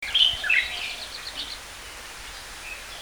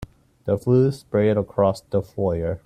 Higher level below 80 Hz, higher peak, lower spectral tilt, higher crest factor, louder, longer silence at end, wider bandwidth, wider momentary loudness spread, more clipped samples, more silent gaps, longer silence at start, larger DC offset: about the same, -50 dBFS vs -48 dBFS; about the same, -6 dBFS vs -6 dBFS; second, 0.5 dB/octave vs -8.5 dB/octave; first, 22 dB vs 16 dB; about the same, -24 LUFS vs -22 LUFS; about the same, 0 s vs 0.1 s; first, over 20 kHz vs 13 kHz; first, 19 LU vs 7 LU; neither; neither; about the same, 0 s vs 0 s; neither